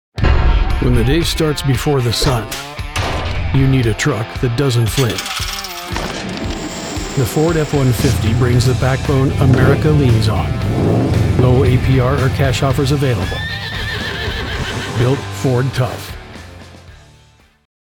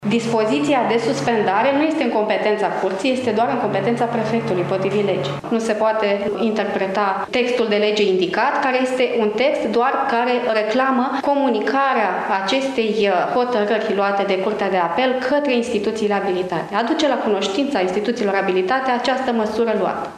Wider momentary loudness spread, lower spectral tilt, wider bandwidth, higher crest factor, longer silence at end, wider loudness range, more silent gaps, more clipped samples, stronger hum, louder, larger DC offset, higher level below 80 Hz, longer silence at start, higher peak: first, 10 LU vs 3 LU; about the same, -6 dB/octave vs -5 dB/octave; first, 18.5 kHz vs 12 kHz; about the same, 16 dB vs 14 dB; first, 0.9 s vs 0 s; first, 6 LU vs 2 LU; neither; neither; neither; first, -16 LUFS vs -19 LUFS; neither; first, -24 dBFS vs -60 dBFS; first, 0.15 s vs 0 s; first, 0 dBFS vs -4 dBFS